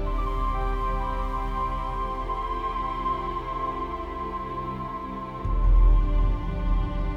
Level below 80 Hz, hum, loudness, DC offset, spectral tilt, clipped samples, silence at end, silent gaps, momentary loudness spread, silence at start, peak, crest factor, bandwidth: -26 dBFS; none; -29 LUFS; under 0.1%; -8 dB/octave; under 0.1%; 0 s; none; 9 LU; 0 s; -10 dBFS; 14 dB; 4.7 kHz